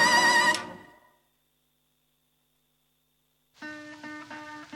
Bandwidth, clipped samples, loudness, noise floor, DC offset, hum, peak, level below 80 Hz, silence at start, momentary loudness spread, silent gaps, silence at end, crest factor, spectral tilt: 16.5 kHz; under 0.1%; -21 LUFS; -73 dBFS; under 0.1%; none; -10 dBFS; -72 dBFS; 0 s; 23 LU; none; 0 s; 20 dB; -1 dB/octave